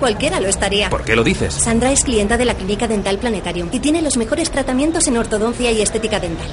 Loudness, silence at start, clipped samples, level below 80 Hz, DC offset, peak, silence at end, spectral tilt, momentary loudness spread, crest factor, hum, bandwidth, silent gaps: -17 LUFS; 0 s; under 0.1%; -30 dBFS; under 0.1%; 0 dBFS; 0 s; -3.5 dB/octave; 5 LU; 16 dB; none; 11 kHz; none